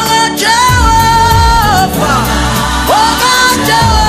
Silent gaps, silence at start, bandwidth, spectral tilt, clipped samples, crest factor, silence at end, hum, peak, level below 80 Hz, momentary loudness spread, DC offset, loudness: none; 0 s; 16 kHz; -3.5 dB/octave; under 0.1%; 8 dB; 0 s; none; 0 dBFS; -18 dBFS; 4 LU; under 0.1%; -8 LUFS